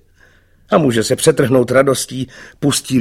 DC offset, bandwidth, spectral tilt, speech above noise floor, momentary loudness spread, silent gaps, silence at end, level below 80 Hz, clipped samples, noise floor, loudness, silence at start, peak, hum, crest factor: under 0.1%; 16.5 kHz; -4.5 dB/octave; 36 dB; 11 LU; none; 0 s; -48 dBFS; under 0.1%; -50 dBFS; -14 LUFS; 0.7 s; 0 dBFS; none; 16 dB